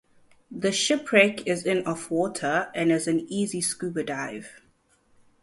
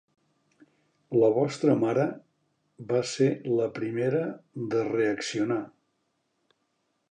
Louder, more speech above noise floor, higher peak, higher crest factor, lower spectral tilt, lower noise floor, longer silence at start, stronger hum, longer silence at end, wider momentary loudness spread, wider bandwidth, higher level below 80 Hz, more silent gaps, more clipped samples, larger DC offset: about the same, -25 LUFS vs -27 LUFS; second, 39 dB vs 49 dB; first, -4 dBFS vs -10 dBFS; about the same, 22 dB vs 18 dB; second, -3.5 dB/octave vs -6 dB/octave; second, -64 dBFS vs -76 dBFS; second, 0.5 s vs 1.1 s; neither; second, 0.85 s vs 1.45 s; about the same, 11 LU vs 10 LU; first, 11.5 kHz vs 10 kHz; first, -66 dBFS vs -74 dBFS; neither; neither; neither